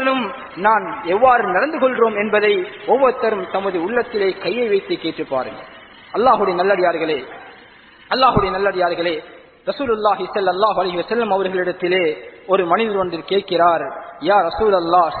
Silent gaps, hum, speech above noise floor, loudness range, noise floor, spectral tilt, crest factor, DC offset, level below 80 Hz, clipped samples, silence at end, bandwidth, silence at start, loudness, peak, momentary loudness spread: none; none; 27 dB; 3 LU; -45 dBFS; -8.5 dB/octave; 16 dB; under 0.1%; -48 dBFS; under 0.1%; 0 s; 4.6 kHz; 0 s; -18 LUFS; -2 dBFS; 9 LU